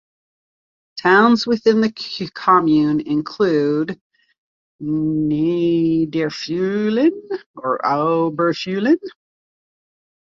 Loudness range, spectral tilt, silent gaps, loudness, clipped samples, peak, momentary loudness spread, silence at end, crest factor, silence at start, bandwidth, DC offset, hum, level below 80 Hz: 4 LU; -6.5 dB/octave; 4.01-4.10 s, 4.38-4.79 s, 7.46-7.54 s; -18 LUFS; under 0.1%; -2 dBFS; 13 LU; 1.15 s; 18 dB; 0.95 s; 7.2 kHz; under 0.1%; none; -60 dBFS